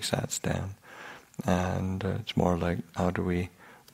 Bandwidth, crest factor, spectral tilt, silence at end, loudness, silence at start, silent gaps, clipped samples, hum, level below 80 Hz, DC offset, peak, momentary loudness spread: 16 kHz; 22 dB; -5.5 dB/octave; 0.15 s; -30 LUFS; 0 s; none; under 0.1%; none; -52 dBFS; under 0.1%; -8 dBFS; 15 LU